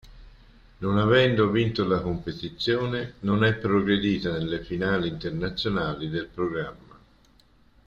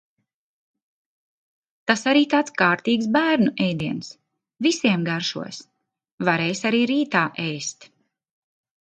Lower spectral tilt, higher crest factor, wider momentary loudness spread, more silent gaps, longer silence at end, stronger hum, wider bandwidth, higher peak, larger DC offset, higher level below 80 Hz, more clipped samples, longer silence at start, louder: first, -7.5 dB/octave vs -4.5 dB/octave; about the same, 18 dB vs 20 dB; second, 10 LU vs 13 LU; second, none vs 6.12-6.18 s; about the same, 1.15 s vs 1.15 s; neither; second, 7.2 kHz vs 9 kHz; second, -8 dBFS vs -4 dBFS; neither; first, -48 dBFS vs -66 dBFS; neither; second, 0.05 s vs 1.85 s; second, -25 LUFS vs -21 LUFS